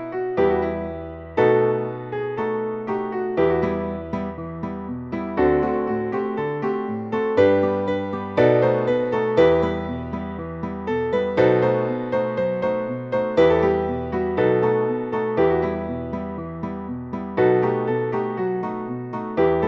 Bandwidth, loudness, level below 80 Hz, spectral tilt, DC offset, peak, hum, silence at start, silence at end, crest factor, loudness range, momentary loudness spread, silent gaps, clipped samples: 6.6 kHz; -22 LUFS; -46 dBFS; -8.5 dB/octave; under 0.1%; -4 dBFS; none; 0 s; 0 s; 18 dB; 4 LU; 12 LU; none; under 0.1%